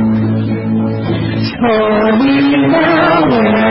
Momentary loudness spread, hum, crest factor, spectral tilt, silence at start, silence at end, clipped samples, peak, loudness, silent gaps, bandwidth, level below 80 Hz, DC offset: 6 LU; none; 12 dB; -10.5 dB/octave; 0 s; 0 s; under 0.1%; 0 dBFS; -12 LUFS; none; 5.8 kHz; -40 dBFS; under 0.1%